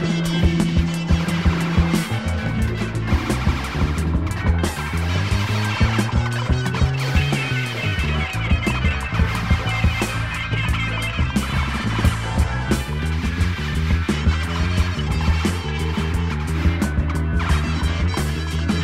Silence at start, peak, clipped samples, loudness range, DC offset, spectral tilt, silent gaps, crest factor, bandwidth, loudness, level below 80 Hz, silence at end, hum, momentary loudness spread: 0 s; -4 dBFS; under 0.1%; 1 LU; 0.4%; -5.5 dB/octave; none; 16 dB; 15 kHz; -21 LUFS; -26 dBFS; 0 s; none; 4 LU